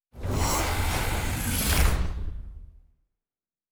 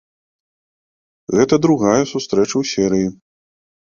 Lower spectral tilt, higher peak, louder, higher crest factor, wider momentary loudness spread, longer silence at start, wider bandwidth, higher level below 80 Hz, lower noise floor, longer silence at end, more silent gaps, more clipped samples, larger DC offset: second, -3.5 dB/octave vs -5.5 dB/octave; second, -10 dBFS vs -2 dBFS; second, -27 LUFS vs -17 LUFS; about the same, 18 dB vs 18 dB; first, 15 LU vs 7 LU; second, 0.15 s vs 1.3 s; first, over 20 kHz vs 7.4 kHz; first, -30 dBFS vs -52 dBFS; about the same, under -90 dBFS vs under -90 dBFS; first, 1.05 s vs 0.75 s; neither; neither; neither